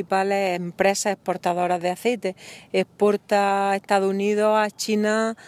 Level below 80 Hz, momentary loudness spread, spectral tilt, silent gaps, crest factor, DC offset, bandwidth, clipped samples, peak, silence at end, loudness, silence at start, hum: -68 dBFS; 6 LU; -4.5 dB/octave; none; 18 dB; under 0.1%; 16 kHz; under 0.1%; -4 dBFS; 0.05 s; -22 LUFS; 0 s; none